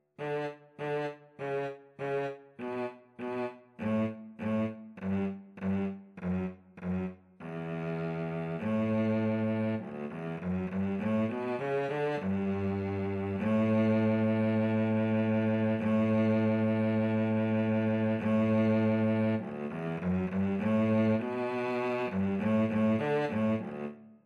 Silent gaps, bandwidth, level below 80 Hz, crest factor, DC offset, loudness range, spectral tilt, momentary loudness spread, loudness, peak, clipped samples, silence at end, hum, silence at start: none; 6.4 kHz; -68 dBFS; 12 dB; under 0.1%; 8 LU; -9 dB/octave; 12 LU; -31 LUFS; -18 dBFS; under 0.1%; 0.15 s; none; 0.2 s